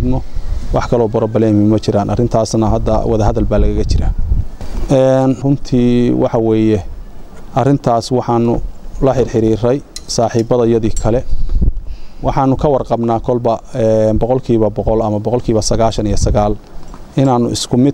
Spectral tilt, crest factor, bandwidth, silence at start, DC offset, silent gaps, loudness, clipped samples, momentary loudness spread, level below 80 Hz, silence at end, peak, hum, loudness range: -7 dB/octave; 12 dB; 11.5 kHz; 0 s; under 0.1%; none; -14 LUFS; under 0.1%; 8 LU; -22 dBFS; 0 s; 0 dBFS; none; 2 LU